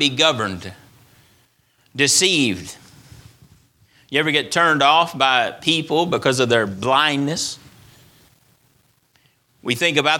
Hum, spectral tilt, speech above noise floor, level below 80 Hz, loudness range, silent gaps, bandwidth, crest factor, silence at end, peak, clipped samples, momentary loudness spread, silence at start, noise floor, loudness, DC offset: none; -2.5 dB/octave; 42 dB; -60 dBFS; 5 LU; none; 18.5 kHz; 20 dB; 0 s; 0 dBFS; under 0.1%; 16 LU; 0 s; -60 dBFS; -17 LUFS; under 0.1%